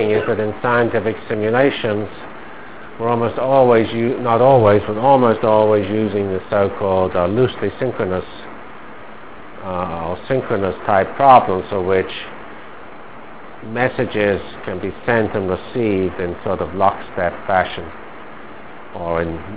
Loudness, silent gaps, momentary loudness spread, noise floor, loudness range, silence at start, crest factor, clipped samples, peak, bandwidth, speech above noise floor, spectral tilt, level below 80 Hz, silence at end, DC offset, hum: -17 LUFS; none; 23 LU; -37 dBFS; 8 LU; 0 s; 18 dB; under 0.1%; 0 dBFS; 4 kHz; 21 dB; -10.5 dB/octave; -44 dBFS; 0 s; 2%; none